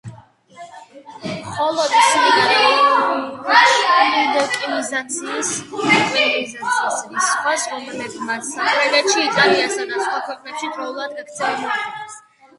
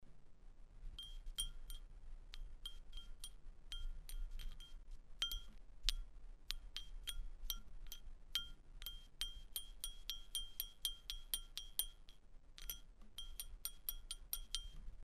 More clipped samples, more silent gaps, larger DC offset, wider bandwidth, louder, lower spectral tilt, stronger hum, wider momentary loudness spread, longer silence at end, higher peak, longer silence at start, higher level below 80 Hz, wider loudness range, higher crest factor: neither; neither; neither; second, 11.5 kHz vs 15.5 kHz; first, -17 LUFS vs -48 LUFS; first, -1.5 dB/octave vs 0 dB/octave; neither; about the same, 14 LU vs 16 LU; first, 0.4 s vs 0 s; first, 0 dBFS vs -12 dBFS; about the same, 0.05 s vs 0 s; second, -64 dBFS vs -52 dBFS; about the same, 5 LU vs 6 LU; second, 18 dB vs 36 dB